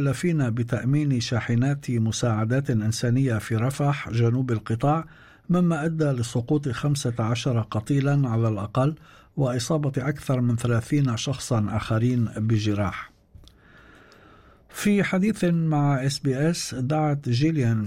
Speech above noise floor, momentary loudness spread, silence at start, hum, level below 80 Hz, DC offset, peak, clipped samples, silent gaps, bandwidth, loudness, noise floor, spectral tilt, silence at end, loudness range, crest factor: 29 dB; 5 LU; 0 s; none; -52 dBFS; under 0.1%; -12 dBFS; under 0.1%; none; 15 kHz; -24 LUFS; -52 dBFS; -6.5 dB/octave; 0 s; 3 LU; 12 dB